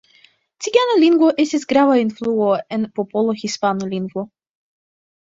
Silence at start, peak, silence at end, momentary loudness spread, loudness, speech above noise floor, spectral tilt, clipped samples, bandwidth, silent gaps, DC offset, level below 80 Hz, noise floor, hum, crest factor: 0.6 s; -2 dBFS; 0.95 s; 12 LU; -18 LUFS; 37 dB; -5 dB/octave; under 0.1%; 7.8 kHz; none; under 0.1%; -64 dBFS; -54 dBFS; none; 16 dB